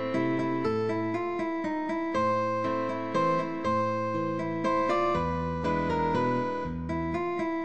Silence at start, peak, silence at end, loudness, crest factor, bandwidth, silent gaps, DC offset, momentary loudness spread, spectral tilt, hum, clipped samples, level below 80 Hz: 0 s; -16 dBFS; 0 s; -29 LUFS; 14 dB; 8.6 kHz; none; 0.4%; 4 LU; -7 dB/octave; none; under 0.1%; -52 dBFS